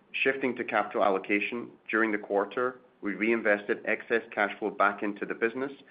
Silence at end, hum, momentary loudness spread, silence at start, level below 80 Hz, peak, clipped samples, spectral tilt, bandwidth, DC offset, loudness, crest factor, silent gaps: 0.1 s; none; 7 LU; 0.15 s; -76 dBFS; -10 dBFS; under 0.1%; -8.5 dB/octave; 5 kHz; under 0.1%; -29 LUFS; 18 dB; none